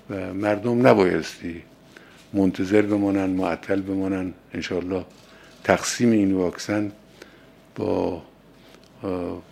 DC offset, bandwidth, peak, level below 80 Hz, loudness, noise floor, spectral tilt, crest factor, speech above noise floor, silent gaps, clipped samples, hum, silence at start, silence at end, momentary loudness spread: under 0.1%; 14.5 kHz; 0 dBFS; -58 dBFS; -23 LUFS; -50 dBFS; -5.5 dB/octave; 24 dB; 28 dB; none; under 0.1%; none; 0.1 s; 0.1 s; 14 LU